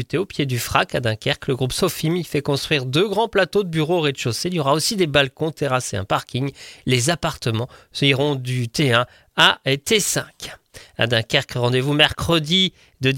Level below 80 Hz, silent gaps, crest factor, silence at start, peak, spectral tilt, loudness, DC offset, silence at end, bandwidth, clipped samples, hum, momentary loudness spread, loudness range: -48 dBFS; none; 20 dB; 0 s; 0 dBFS; -4 dB/octave; -20 LUFS; under 0.1%; 0 s; 17 kHz; under 0.1%; none; 8 LU; 2 LU